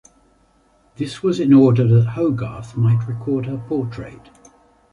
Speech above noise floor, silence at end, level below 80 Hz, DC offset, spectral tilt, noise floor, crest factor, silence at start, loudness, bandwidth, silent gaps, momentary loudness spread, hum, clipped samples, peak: 40 dB; 0.75 s; -50 dBFS; under 0.1%; -9 dB/octave; -57 dBFS; 16 dB; 1 s; -18 LUFS; 10.5 kHz; none; 16 LU; none; under 0.1%; -2 dBFS